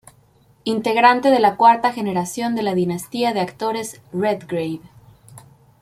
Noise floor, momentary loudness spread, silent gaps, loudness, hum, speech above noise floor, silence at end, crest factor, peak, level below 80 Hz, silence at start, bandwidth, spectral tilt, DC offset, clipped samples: -55 dBFS; 13 LU; none; -19 LUFS; none; 36 dB; 0.4 s; 18 dB; -2 dBFS; -62 dBFS; 0.65 s; 15.5 kHz; -5 dB/octave; under 0.1%; under 0.1%